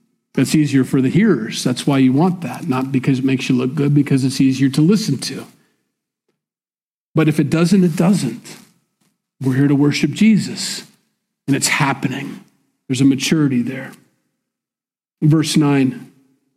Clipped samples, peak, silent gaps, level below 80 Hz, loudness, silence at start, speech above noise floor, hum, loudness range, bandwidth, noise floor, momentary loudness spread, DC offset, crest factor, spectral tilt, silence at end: under 0.1%; -4 dBFS; 6.84-7.14 s; -58 dBFS; -16 LUFS; 0.35 s; over 75 dB; none; 3 LU; 15.5 kHz; under -90 dBFS; 11 LU; under 0.1%; 14 dB; -5.5 dB/octave; 0.5 s